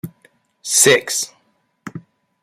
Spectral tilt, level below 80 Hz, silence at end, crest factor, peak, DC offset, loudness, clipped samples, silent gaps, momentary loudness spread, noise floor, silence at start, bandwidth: -1.5 dB/octave; -66 dBFS; 0.45 s; 20 dB; 0 dBFS; under 0.1%; -14 LUFS; under 0.1%; none; 24 LU; -63 dBFS; 0.05 s; 16 kHz